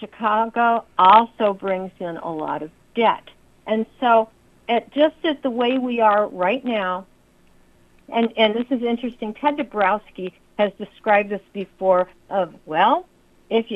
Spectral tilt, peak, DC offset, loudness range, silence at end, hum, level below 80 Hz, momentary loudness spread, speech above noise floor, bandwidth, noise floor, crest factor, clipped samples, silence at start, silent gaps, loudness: -7 dB/octave; 0 dBFS; under 0.1%; 3 LU; 0 s; none; -60 dBFS; 12 LU; 34 dB; 7.8 kHz; -54 dBFS; 20 dB; under 0.1%; 0 s; none; -21 LUFS